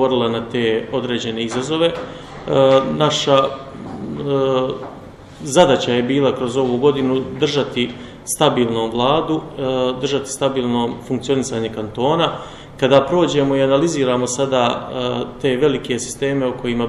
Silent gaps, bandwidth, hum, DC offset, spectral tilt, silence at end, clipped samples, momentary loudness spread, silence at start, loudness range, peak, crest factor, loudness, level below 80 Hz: none; 14 kHz; none; under 0.1%; -5 dB/octave; 0 s; under 0.1%; 11 LU; 0 s; 2 LU; 0 dBFS; 18 dB; -18 LUFS; -48 dBFS